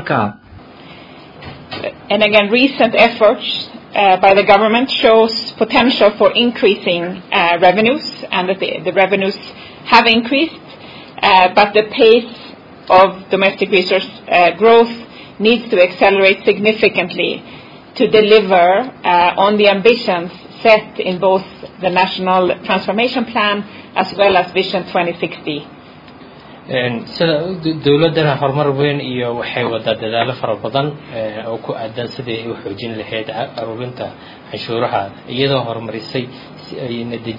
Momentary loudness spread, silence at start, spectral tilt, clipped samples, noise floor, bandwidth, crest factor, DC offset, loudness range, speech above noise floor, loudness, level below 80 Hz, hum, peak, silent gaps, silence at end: 15 LU; 0 s; -6.5 dB/octave; under 0.1%; -38 dBFS; 6 kHz; 14 dB; under 0.1%; 9 LU; 24 dB; -14 LUFS; -52 dBFS; none; 0 dBFS; none; 0 s